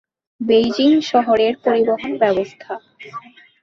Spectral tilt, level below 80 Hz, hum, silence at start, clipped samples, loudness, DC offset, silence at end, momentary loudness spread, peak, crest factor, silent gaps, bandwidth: -5.5 dB/octave; -58 dBFS; none; 0.4 s; under 0.1%; -17 LUFS; under 0.1%; 0.45 s; 20 LU; -2 dBFS; 16 dB; none; 7.4 kHz